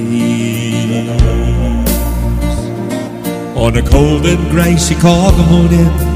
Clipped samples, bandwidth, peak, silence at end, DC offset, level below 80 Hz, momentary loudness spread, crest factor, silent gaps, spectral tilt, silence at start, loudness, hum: 0.3%; 16 kHz; 0 dBFS; 0 s; under 0.1%; -16 dBFS; 10 LU; 10 dB; none; -6 dB/octave; 0 s; -12 LUFS; none